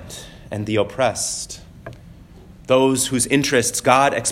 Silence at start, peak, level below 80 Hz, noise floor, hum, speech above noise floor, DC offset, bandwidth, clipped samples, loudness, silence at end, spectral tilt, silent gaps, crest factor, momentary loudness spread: 0 s; 0 dBFS; -48 dBFS; -43 dBFS; none; 24 dB; under 0.1%; 16.5 kHz; under 0.1%; -18 LUFS; 0 s; -3.5 dB/octave; none; 20 dB; 22 LU